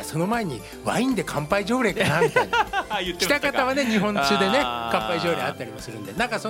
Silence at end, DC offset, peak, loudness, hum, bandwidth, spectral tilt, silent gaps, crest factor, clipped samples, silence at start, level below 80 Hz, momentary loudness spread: 0 s; under 0.1%; -4 dBFS; -23 LUFS; none; 16.5 kHz; -4.5 dB/octave; none; 20 dB; under 0.1%; 0 s; -48 dBFS; 9 LU